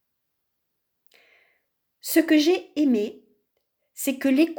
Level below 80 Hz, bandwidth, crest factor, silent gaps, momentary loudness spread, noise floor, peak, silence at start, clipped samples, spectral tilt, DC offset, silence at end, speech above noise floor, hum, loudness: -78 dBFS; over 20 kHz; 18 dB; none; 11 LU; -78 dBFS; -6 dBFS; 2.05 s; under 0.1%; -3 dB/octave; under 0.1%; 0.05 s; 57 dB; none; -23 LUFS